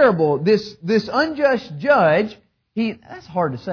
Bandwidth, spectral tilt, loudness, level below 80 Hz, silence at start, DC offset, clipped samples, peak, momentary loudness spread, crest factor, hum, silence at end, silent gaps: 5.4 kHz; -7 dB/octave; -19 LUFS; -58 dBFS; 0 s; under 0.1%; under 0.1%; -6 dBFS; 12 LU; 14 dB; none; 0 s; none